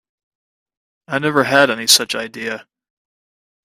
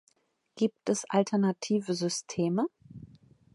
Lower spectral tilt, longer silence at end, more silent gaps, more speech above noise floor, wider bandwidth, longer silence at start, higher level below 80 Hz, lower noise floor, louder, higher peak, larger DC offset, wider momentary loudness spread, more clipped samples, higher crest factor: second, -2 dB/octave vs -5.5 dB/octave; first, 1.15 s vs 0.5 s; neither; first, over 74 dB vs 43 dB; first, 15.5 kHz vs 11.5 kHz; first, 1.1 s vs 0.55 s; first, -64 dBFS vs -72 dBFS; first, under -90 dBFS vs -72 dBFS; first, -15 LUFS vs -30 LUFS; first, 0 dBFS vs -12 dBFS; neither; about the same, 14 LU vs 14 LU; neither; about the same, 20 dB vs 20 dB